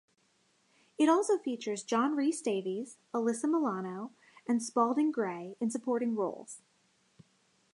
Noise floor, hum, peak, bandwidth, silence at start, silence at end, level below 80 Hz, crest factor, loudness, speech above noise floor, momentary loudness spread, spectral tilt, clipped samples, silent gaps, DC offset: -72 dBFS; none; -16 dBFS; 11.5 kHz; 1 s; 1.15 s; -88 dBFS; 18 dB; -32 LUFS; 41 dB; 13 LU; -5 dB/octave; under 0.1%; none; under 0.1%